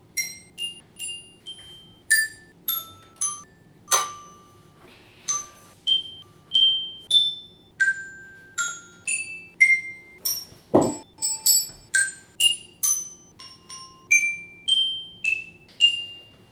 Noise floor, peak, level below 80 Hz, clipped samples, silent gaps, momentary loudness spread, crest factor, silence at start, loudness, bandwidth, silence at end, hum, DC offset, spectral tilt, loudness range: -52 dBFS; -2 dBFS; -64 dBFS; under 0.1%; none; 21 LU; 24 dB; 0.15 s; -22 LUFS; over 20 kHz; 0.3 s; none; under 0.1%; 0 dB/octave; 6 LU